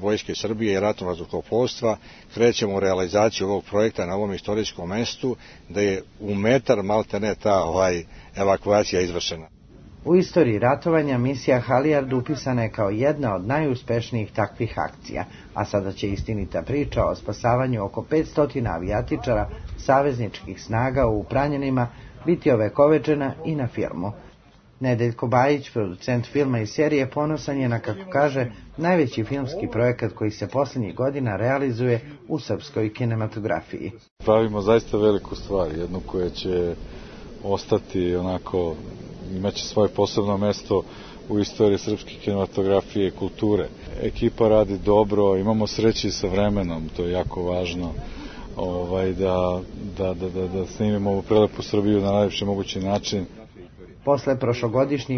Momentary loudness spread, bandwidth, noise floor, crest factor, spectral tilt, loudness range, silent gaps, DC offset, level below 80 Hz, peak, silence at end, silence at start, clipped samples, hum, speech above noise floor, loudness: 10 LU; 6.6 kHz; -52 dBFS; 20 dB; -6.5 dB/octave; 4 LU; 34.11-34.16 s; under 0.1%; -42 dBFS; -4 dBFS; 0 s; 0 s; under 0.1%; none; 29 dB; -23 LUFS